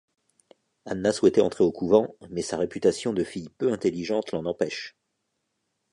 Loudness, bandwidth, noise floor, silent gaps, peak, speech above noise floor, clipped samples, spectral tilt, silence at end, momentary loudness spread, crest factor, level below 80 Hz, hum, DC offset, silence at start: -26 LUFS; 11 kHz; -78 dBFS; none; -6 dBFS; 53 dB; under 0.1%; -5.5 dB/octave; 1.05 s; 12 LU; 20 dB; -60 dBFS; none; under 0.1%; 0.85 s